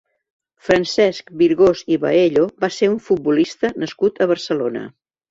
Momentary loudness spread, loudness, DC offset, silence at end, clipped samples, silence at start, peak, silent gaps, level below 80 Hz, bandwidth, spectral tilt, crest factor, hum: 7 LU; -18 LUFS; under 0.1%; 0.4 s; under 0.1%; 0.65 s; -2 dBFS; none; -54 dBFS; 7.8 kHz; -5.5 dB/octave; 16 dB; none